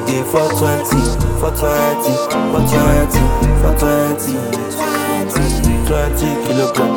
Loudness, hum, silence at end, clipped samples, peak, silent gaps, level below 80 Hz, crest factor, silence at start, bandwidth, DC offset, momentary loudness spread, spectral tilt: -15 LUFS; none; 0 s; under 0.1%; 0 dBFS; none; -20 dBFS; 14 dB; 0 s; 18 kHz; under 0.1%; 4 LU; -5.5 dB/octave